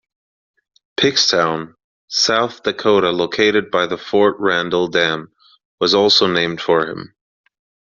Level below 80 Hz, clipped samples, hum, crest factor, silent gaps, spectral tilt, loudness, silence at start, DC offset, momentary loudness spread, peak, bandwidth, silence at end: -58 dBFS; under 0.1%; none; 16 dB; 1.84-2.08 s, 5.65-5.78 s; -1.5 dB/octave; -16 LUFS; 1 s; under 0.1%; 10 LU; -2 dBFS; 7.4 kHz; 0.85 s